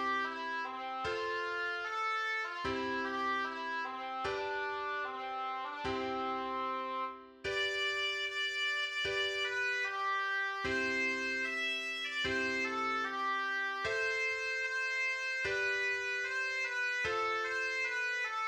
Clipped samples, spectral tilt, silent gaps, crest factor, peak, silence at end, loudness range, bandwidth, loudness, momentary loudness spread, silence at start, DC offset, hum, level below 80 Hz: under 0.1%; -2 dB/octave; none; 14 dB; -22 dBFS; 0 s; 4 LU; 16.5 kHz; -34 LUFS; 5 LU; 0 s; under 0.1%; none; -66 dBFS